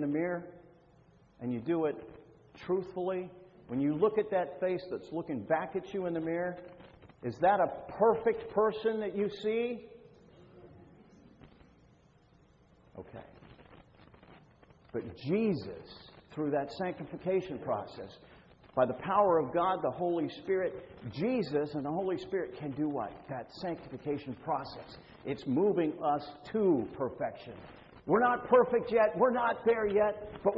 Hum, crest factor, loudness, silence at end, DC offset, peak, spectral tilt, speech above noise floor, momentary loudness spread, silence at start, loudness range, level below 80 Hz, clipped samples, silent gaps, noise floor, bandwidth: none; 20 dB; -32 LUFS; 0 s; under 0.1%; -12 dBFS; -8.5 dB/octave; 31 dB; 18 LU; 0 s; 8 LU; -66 dBFS; under 0.1%; none; -63 dBFS; 7.6 kHz